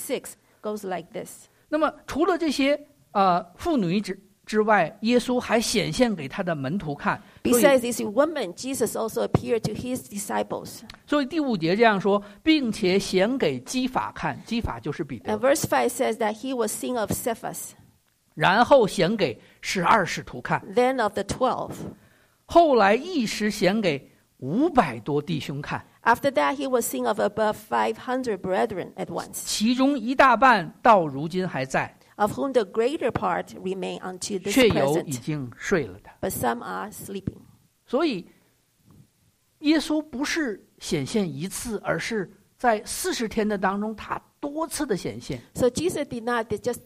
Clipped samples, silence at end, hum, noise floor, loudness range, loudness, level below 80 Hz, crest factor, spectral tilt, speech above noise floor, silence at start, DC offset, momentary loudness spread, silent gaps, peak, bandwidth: under 0.1%; 0.05 s; none; -65 dBFS; 6 LU; -24 LUFS; -52 dBFS; 20 dB; -4.5 dB/octave; 41 dB; 0 s; under 0.1%; 13 LU; none; -6 dBFS; 15.5 kHz